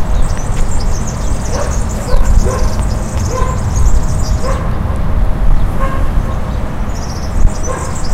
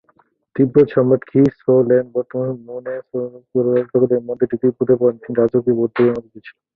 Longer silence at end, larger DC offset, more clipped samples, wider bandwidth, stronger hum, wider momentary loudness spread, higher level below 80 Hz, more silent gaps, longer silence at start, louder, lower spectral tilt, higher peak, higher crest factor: second, 0 s vs 0.25 s; neither; first, 0.4% vs under 0.1%; first, 12.5 kHz vs 4.5 kHz; neither; second, 5 LU vs 12 LU; first, -14 dBFS vs -58 dBFS; neither; second, 0 s vs 0.55 s; about the same, -17 LUFS vs -17 LUFS; second, -5.5 dB/octave vs -10.5 dB/octave; about the same, 0 dBFS vs -2 dBFS; second, 10 dB vs 16 dB